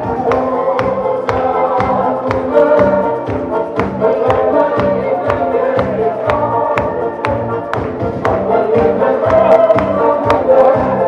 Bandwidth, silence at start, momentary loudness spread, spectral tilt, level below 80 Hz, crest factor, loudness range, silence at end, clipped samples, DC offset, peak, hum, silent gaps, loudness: 8.8 kHz; 0 s; 8 LU; -8 dB/octave; -38 dBFS; 12 dB; 3 LU; 0 s; under 0.1%; under 0.1%; 0 dBFS; none; none; -13 LUFS